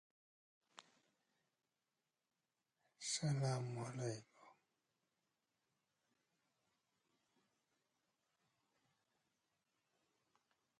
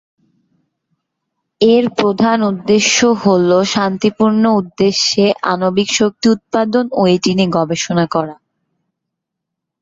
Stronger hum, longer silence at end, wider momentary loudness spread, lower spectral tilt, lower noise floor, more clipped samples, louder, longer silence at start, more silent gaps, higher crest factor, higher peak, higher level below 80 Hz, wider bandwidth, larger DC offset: neither; first, 6.25 s vs 1.5 s; first, 24 LU vs 4 LU; about the same, -4.5 dB/octave vs -4.5 dB/octave; first, under -90 dBFS vs -78 dBFS; neither; second, -44 LUFS vs -13 LUFS; second, 0.75 s vs 1.6 s; neither; first, 22 dB vs 14 dB; second, -30 dBFS vs -2 dBFS; second, -86 dBFS vs -54 dBFS; first, 11.5 kHz vs 7.8 kHz; neither